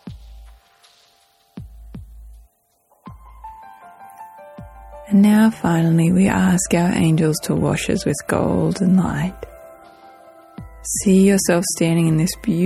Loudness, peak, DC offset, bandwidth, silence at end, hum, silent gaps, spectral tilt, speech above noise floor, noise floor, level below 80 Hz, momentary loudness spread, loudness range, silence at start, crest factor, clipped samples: -17 LUFS; -4 dBFS; under 0.1%; 13.5 kHz; 0 s; none; none; -6 dB/octave; 45 dB; -61 dBFS; -42 dBFS; 26 LU; 5 LU; 0.05 s; 16 dB; under 0.1%